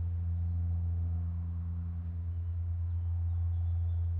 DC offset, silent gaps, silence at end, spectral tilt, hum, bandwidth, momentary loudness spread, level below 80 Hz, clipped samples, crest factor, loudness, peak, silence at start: under 0.1%; none; 0 s; -12 dB/octave; none; 1.6 kHz; 5 LU; -40 dBFS; under 0.1%; 6 dB; -35 LUFS; -26 dBFS; 0 s